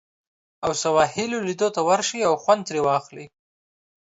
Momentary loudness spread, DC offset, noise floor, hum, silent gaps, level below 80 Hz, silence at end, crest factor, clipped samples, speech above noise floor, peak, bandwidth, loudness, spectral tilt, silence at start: 7 LU; under 0.1%; under -90 dBFS; none; none; -62 dBFS; 0.8 s; 20 dB; under 0.1%; over 68 dB; -4 dBFS; 8 kHz; -22 LUFS; -3.5 dB/octave; 0.6 s